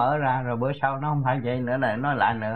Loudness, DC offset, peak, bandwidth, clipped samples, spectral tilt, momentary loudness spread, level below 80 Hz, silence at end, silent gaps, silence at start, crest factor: -25 LUFS; 0.4%; -10 dBFS; 4.5 kHz; under 0.1%; -9.5 dB/octave; 3 LU; -58 dBFS; 0 s; none; 0 s; 16 dB